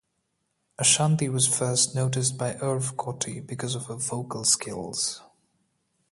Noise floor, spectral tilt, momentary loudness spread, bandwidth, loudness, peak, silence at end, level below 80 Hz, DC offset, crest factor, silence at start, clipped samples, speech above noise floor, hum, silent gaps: -76 dBFS; -3 dB/octave; 11 LU; 12 kHz; -25 LUFS; -6 dBFS; 0.9 s; -64 dBFS; under 0.1%; 22 dB; 0.8 s; under 0.1%; 50 dB; none; none